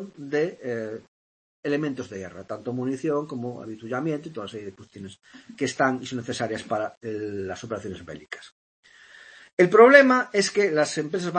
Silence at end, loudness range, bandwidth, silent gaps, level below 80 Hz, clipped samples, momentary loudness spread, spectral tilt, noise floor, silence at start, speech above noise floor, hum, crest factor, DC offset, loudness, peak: 0 s; 11 LU; 8.8 kHz; 1.08-1.63 s, 6.97-7.01 s, 8.52-8.83 s, 9.53-9.57 s; -68 dBFS; under 0.1%; 20 LU; -5 dB/octave; -50 dBFS; 0 s; 26 dB; none; 24 dB; under 0.1%; -23 LUFS; 0 dBFS